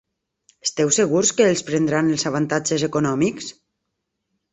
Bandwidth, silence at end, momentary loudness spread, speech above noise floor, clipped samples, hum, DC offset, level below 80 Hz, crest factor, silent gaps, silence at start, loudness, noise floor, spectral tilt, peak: 8.4 kHz; 1 s; 9 LU; 58 dB; under 0.1%; none; under 0.1%; -60 dBFS; 18 dB; none; 0.65 s; -20 LUFS; -78 dBFS; -4 dB/octave; -4 dBFS